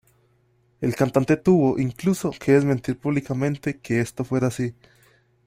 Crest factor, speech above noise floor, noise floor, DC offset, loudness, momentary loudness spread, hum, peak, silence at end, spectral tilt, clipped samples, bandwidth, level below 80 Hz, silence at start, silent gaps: 20 dB; 41 dB; -63 dBFS; under 0.1%; -23 LUFS; 9 LU; none; -4 dBFS; 0.75 s; -7.5 dB/octave; under 0.1%; 16 kHz; -56 dBFS; 0.8 s; none